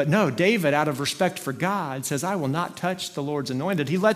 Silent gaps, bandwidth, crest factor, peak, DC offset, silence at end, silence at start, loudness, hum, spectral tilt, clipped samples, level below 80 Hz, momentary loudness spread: none; 16 kHz; 18 dB; -6 dBFS; under 0.1%; 0 s; 0 s; -25 LUFS; none; -5 dB/octave; under 0.1%; -66 dBFS; 7 LU